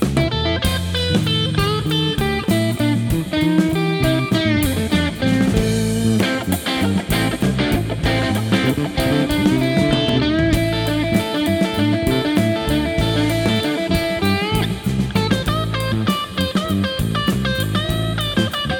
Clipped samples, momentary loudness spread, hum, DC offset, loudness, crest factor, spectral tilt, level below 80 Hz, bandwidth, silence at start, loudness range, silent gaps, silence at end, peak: under 0.1%; 3 LU; none; under 0.1%; -18 LUFS; 16 dB; -5.5 dB/octave; -32 dBFS; over 20 kHz; 0 s; 2 LU; none; 0 s; -2 dBFS